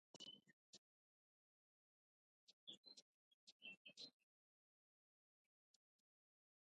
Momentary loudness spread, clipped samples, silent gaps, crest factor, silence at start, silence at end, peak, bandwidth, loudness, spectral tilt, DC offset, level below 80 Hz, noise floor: 10 LU; under 0.1%; 0.53-2.47 s, 2.53-2.67 s, 2.77-2.83 s, 3.02-3.60 s, 3.77-3.85 s; 24 dB; 0.15 s; 2.55 s; -46 dBFS; 9 kHz; -62 LUFS; -1 dB/octave; under 0.1%; under -90 dBFS; under -90 dBFS